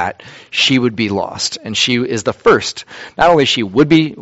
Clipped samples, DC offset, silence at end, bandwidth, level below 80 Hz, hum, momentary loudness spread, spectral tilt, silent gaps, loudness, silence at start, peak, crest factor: under 0.1%; under 0.1%; 0 s; 8.2 kHz; -46 dBFS; none; 10 LU; -4 dB/octave; none; -14 LUFS; 0 s; 0 dBFS; 14 dB